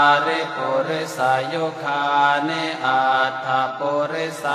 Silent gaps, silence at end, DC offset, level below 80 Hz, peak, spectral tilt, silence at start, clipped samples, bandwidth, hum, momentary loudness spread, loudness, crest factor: none; 0 s; under 0.1%; -70 dBFS; -4 dBFS; -4 dB/octave; 0 s; under 0.1%; 14.5 kHz; none; 7 LU; -20 LUFS; 16 dB